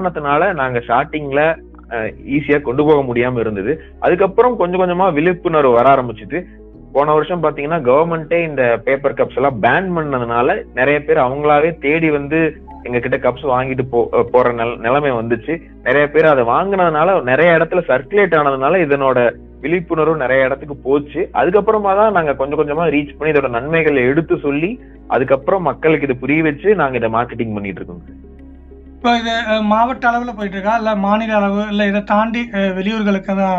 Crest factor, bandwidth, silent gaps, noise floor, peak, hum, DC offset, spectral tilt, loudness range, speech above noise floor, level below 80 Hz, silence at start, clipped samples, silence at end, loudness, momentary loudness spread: 16 dB; 7.2 kHz; none; -37 dBFS; 0 dBFS; none; under 0.1%; -7.5 dB/octave; 3 LU; 22 dB; -40 dBFS; 0 s; under 0.1%; 0 s; -15 LUFS; 7 LU